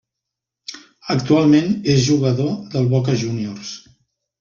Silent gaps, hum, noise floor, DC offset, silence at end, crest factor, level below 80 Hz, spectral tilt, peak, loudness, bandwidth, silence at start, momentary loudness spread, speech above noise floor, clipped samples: none; none; -83 dBFS; under 0.1%; 0.6 s; 16 dB; -52 dBFS; -6.5 dB/octave; -4 dBFS; -18 LUFS; 7.4 kHz; 0.7 s; 20 LU; 66 dB; under 0.1%